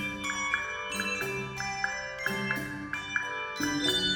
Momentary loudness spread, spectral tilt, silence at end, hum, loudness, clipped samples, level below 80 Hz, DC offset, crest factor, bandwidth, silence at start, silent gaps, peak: 5 LU; -2.5 dB/octave; 0 s; none; -31 LUFS; under 0.1%; -56 dBFS; under 0.1%; 20 dB; over 20 kHz; 0 s; none; -12 dBFS